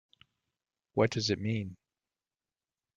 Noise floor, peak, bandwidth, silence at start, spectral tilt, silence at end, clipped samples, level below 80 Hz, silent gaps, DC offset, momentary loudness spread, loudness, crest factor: under -90 dBFS; -12 dBFS; 7.6 kHz; 0.95 s; -5.5 dB/octave; 1.2 s; under 0.1%; -68 dBFS; none; under 0.1%; 8 LU; -32 LUFS; 24 dB